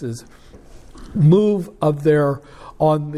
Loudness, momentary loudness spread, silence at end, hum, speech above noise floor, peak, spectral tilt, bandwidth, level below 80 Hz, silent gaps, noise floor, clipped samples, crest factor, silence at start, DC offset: -17 LUFS; 16 LU; 0 s; none; 21 dB; -4 dBFS; -8.5 dB/octave; 11 kHz; -46 dBFS; none; -39 dBFS; under 0.1%; 16 dB; 0 s; under 0.1%